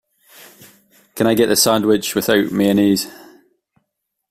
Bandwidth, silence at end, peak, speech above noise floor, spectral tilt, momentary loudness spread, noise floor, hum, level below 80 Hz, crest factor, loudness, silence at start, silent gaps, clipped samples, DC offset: 16 kHz; 1.15 s; -2 dBFS; 60 dB; -4 dB/octave; 7 LU; -75 dBFS; none; -54 dBFS; 16 dB; -16 LUFS; 1.15 s; none; under 0.1%; under 0.1%